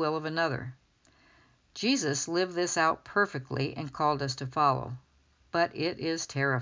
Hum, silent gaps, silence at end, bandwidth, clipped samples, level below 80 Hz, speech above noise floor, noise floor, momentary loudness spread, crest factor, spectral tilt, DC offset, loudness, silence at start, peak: none; none; 0 s; 7.6 kHz; under 0.1%; -64 dBFS; 34 dB; -64 dBFS; 7 LU; 18 dB; -4 dB/octave; under 0.1%; -30 LUFS; 0 s; -12 dBFS